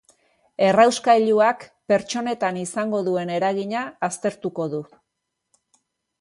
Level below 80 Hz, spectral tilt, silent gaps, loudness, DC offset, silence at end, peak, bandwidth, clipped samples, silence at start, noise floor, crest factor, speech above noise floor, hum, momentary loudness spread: -68 dBFS; -4.5 dB/octave; none; -21 LUFS; under 0.1%; 1.35 s; -4 dBFS; 11.5 kHz; under 0.1%; 0.6 s; -79 dBFS; 18 dB; 59 dB; none; 12 LU